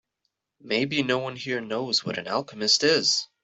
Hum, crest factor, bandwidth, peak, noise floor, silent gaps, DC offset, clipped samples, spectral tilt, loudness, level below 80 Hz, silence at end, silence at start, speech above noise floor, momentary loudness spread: none; 18 dB; 8.4 kHz; -8 dBFS; -79 dBFS; none; under 0.1%; under 0.1%; -2.5 dB/octave; -24 LUFS; -70 dBFS; 0.2 s; 0.65 s; 54 dB; 10 LU